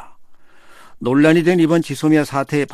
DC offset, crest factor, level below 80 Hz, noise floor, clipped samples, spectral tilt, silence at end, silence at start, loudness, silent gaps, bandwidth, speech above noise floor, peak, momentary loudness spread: under 0.1%; 16 dB; -56 dBFS; -40 dBFS; under 0.1%; -6.5 dB/octave; 0 s; 0 s; -16 LUFS; none; 14 kHz; 26 dB; -2 dBFS; 7 LU